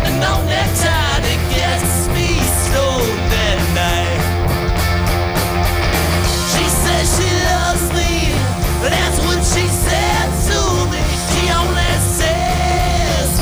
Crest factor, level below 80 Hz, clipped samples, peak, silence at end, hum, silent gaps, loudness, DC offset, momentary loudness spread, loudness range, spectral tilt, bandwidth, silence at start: 12 dB; -20 dBFS; under 0.1%; -2 dBFS; 0 s; none; none; -15 LUFS; under 0.1%; 2 LU; 1 LU; -4 dB/octave; over 20 kHz; 0 s